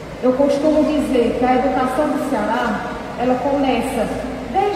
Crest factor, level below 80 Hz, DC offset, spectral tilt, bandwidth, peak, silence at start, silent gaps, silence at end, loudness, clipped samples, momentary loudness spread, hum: 14 dB; -40 dBFS; under 0.1%; -6 dB/octave; 15.5 kHz; -4 dBFS; 0 s; none; 0 s; -18 LUFS; under 0.1%; 6 LU; none